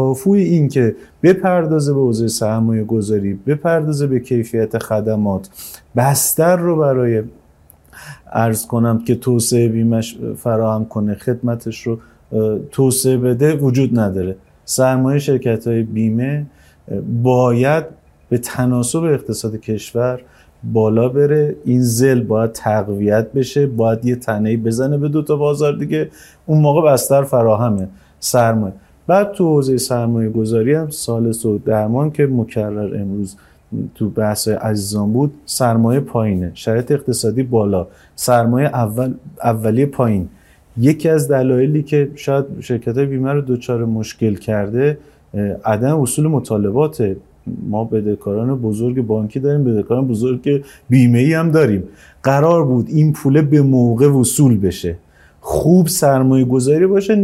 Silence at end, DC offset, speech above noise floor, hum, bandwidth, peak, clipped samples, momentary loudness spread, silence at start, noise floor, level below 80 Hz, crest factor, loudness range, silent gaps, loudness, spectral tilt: 0 s; under 0.1%; 33 dB; none; 16 kHz; 0 dBFS; under 0.1%; 10 LU; 0 s; -48 dBFS; -48 dBFS; 14 dB; 5 LU; none; -16 LUFS; -6.5 dB/octave